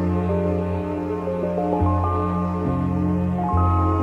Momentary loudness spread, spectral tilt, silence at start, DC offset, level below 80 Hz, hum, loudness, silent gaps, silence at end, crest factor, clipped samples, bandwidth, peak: 6 LU; -10.5 dB/octave; 0 s; under 0.1%; -36 dBFS; none; -22 LUFS; none; 0 s; 12 dB; under 0.1%; 4.4 kHz; -8 dBFS